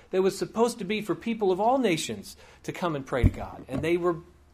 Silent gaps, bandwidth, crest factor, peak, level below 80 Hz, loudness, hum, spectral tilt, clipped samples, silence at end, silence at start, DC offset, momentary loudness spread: none; 15.5 kHz; 18 dB; -8 dBFS; -40 dBFS; -27 LUFS; none; -5.5 dB/octave; under 0.1%; 0.3 s; 0.1 s; under 0.1%; 15 LU